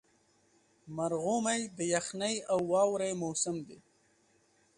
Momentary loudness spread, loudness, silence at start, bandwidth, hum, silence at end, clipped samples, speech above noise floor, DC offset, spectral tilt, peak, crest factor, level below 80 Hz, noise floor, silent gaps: 8 LU; -32 LUFS; 0.85 s; 11.5 kHz; none; 1 s; under 0.1%; 37 dB; under 0.1%; -3.5 dB/octave; -16 dBFS; 20 dB; -74 dBFS; -70 dBFS; none